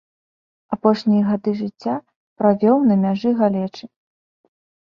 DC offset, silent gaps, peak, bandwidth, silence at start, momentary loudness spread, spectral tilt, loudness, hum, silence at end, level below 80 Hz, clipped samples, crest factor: under 0.1%; 2.16-2.36 s; -2 dBFS; 6.6 kHz; 0.7 s; 13 LU; -9 dB/octave; -19 LUFS; none; 1.1 s; -64 dBFS; under 0.1%; 18 dB